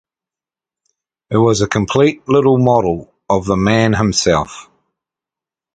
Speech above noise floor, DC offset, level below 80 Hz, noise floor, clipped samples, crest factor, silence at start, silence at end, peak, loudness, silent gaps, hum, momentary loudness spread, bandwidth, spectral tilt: 76 dB; under 0.1%; -40 dBFS; -89 dBFS; under 0.1%; 16 dB; 1.3 s; 1.15 s; 0 dBFS; -14 LUFS; none; none; 7 LU; 9.4 kHz; -5.5 dB/octave